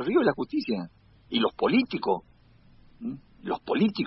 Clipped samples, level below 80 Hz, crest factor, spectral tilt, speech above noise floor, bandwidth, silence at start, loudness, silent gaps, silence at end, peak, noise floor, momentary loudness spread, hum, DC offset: under 0.1%; -60 dBFS; 18 dB; -10 dB/octave; 30 dB; 5.8 kHz; 0 s; -28 LUFS; none; 0 s; -10 dBFS; -56 dBFS; 14 LU; none; under 0.1%